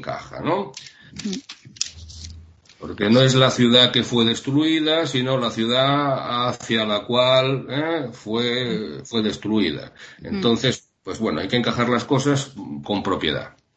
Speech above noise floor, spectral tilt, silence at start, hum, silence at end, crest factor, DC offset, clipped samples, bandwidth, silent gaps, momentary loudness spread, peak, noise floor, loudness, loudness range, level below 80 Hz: 24 dB; -5 dB/octave; 0 s; none; 0.25 s; 20 dB; under 0.1%; under 0.1%; 8.6 kHz; none; 17 LU; 0 dBFS; -45 dBFS; -20 LUFS; 6 LU; -54 dBFS